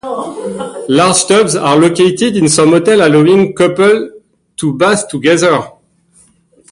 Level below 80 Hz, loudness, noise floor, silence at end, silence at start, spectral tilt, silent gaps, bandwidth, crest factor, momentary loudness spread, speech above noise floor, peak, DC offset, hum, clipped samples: -50 dBFS; -10 LUFS; -49 dBFS; 1 s; 0.05 s; -4.5 dB/octave; none; 11.5 kHz; 10 dB; 13 LU; 40 dB; 0 dBFS; under 0.1%; none; under 0.1%